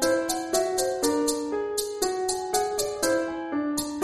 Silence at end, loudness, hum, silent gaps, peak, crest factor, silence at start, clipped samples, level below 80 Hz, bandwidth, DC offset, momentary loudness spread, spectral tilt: 0 s; -26 LUFS; none; none; -8 dBFS; 18 dB; 0 s; under 0.1%; -56 dBFS; 13.5 kHz; under 0.1%; 4 LU; -2 dB/octave